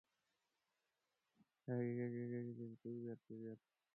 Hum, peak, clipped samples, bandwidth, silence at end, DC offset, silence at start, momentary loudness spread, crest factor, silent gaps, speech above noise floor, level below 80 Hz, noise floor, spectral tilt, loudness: none; -32 dBFS; under 0.1%; 2.9 kHz; 0.4 s; under 0.1%; 1.65 s; 12 LU; 18 dB; none; 42 dB; under -90 dBFS; -90 dBFS; -11 dB/octave; -48 LUFS